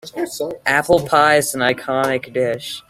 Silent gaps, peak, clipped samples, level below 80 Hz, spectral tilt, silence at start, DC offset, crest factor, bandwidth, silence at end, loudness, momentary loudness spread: none; -2 dBFS; under 0.1%; -52 dBFS; -3.5 dB/octave; 0.05 s; under 0.1%; 16 dB; 16.5 kHz; 0.1 s; -17 LUFS; 10 LU